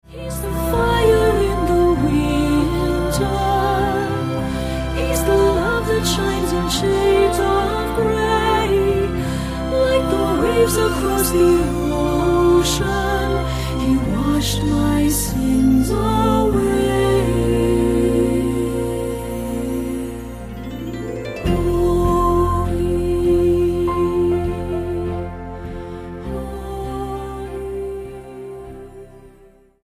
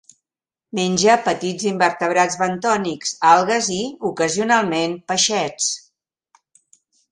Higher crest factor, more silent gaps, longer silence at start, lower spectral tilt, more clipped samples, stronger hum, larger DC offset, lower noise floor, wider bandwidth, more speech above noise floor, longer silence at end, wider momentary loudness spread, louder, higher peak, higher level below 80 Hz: second, 14 dB vs 20 dB; neither; second, 0.1 s vs 0.75 s; first, -5.5 dB/octave vs -3 dB/octave; neither; neither; neither; second, -49 dBFS vs -89 dBFS; first, 15.5 kHz vs 11 kHz; second, 33 dB vs 70 dB; second, 0.55 s vs 1.35 s; first, 13 LU vs 8 LU; about the same, -18 LUFS vs -18 LUFS; second, -4 dBFS vs 0 dBFS; first, -28 dBFS vs -62 dBFS